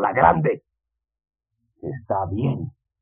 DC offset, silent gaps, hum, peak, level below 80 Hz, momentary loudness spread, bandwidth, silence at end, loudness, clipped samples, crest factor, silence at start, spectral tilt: under 0.1%; none; none; -2 dBFS; -48 dBFS; 18 LU; 3.7 kHz; 0.35 s; -22 LUFS; under 0.1%; 22 dB; 0 s; -7.5 dB/octave